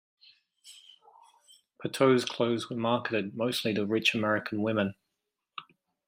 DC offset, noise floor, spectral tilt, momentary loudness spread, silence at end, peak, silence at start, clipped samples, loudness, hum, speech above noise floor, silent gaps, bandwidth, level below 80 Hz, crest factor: under 0.1%; -85 dBFS; -5 dB/octave; 21 LU; 0.45 s; -10 dBFS; 0.65 s; under 0.1%; -29 LUFS; none; 56 dB; none; 16 kHz; -74 dBFS; 22 dB